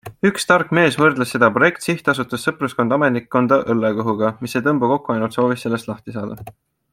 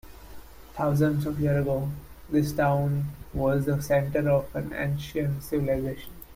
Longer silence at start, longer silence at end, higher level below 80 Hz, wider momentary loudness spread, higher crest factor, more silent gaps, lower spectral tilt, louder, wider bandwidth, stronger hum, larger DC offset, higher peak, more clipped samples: about the same, 0.05 s vs 0.05 s; first, 0.4 s vs 0 s; second, -58 dBFS vs -46 dBFS; about the same, 10 LU vs 9 LU; about the same, 18 dB vs 14 dB; neither; second, -5.5 dB/octave vs -7.5 dB/octave; first, -18 LUFS vs -27 LUFS; about the same, 16.5 kHz vs 16.5 kHz; neither; neither; first, -2 dBFS vs -12 dBFS; neither